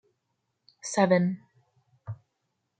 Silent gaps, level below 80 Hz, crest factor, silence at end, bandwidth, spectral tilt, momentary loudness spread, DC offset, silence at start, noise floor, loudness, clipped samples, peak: none; -76 dBFS; 22 dB; 0.65 s; 9.2 kHz; -6 dB/octave; 22 LU; under 0.1%; 0.85 s; -79 dBFS; -25 LUFS; under 0.1%; -8 dBFS